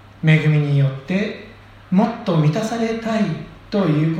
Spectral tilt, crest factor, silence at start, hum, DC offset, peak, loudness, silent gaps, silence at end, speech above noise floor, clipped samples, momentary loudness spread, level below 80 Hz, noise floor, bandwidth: -7.5 dB/octave; 16 dB; 0.2 s; none; under 0.1%; -2 dBFS; -19 LUFS; none; 0 s; 24 dB; under 0.1%; 8 LU; -52 dBFS; -41 dBFS; 9.2 kHz